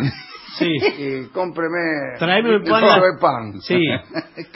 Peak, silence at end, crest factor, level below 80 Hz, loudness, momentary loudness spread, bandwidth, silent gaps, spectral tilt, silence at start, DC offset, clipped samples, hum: 0 dBFS; 0.1 s; 18 dB; -54 dBFS; -18 LUFS; 14 LU; 5.8 kHz; none; -9.5 dB/octave; 0 s; under 0.1%; under 0.1%; none